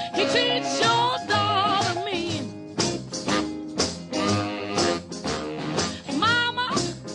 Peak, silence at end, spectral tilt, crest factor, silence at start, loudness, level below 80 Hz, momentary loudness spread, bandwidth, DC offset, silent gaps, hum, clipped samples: -10 dBFS; 0 s; -3.5 dB/octave; 16 dB; 0 s; -24 LUFS; -52 dBFS; 9 LU; 11 kHz; under 0.1%; none; none; under 0.1%